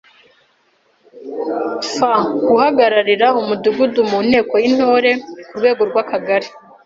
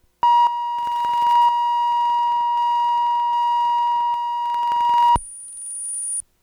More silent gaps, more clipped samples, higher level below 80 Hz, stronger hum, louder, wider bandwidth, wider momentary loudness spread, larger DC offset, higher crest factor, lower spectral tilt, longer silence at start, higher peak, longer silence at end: neither; neither; second, -58 dBFS vs -48 dBFS; neither; first, -15 LUFS vs -19 LUFS; second, 7.8 kHz vs 12 kHz; about the same, 10 LU vs 8 LU; neither; about the same, 14 dB vs 10 dB; first, -4.5 dB/octave vs -0.5 dB/octave; first, 1.15 s vs 0.25 s; first, -2 dBFS vs -10 dBFS; about the same, 0.3 s vs 0.2 s